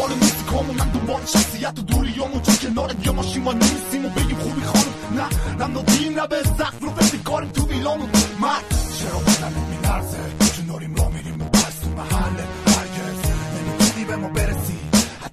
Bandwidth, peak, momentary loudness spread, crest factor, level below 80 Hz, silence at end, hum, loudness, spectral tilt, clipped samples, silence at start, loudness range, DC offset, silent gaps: 13.5 kHz; -2 dBFS; 7 LU; 18 dB; -28 dBFS; 0.05 s; none; -21 LUFS; -4 dB/octave; under 0.1%; 0 s; 1 LU; under 0.1%; none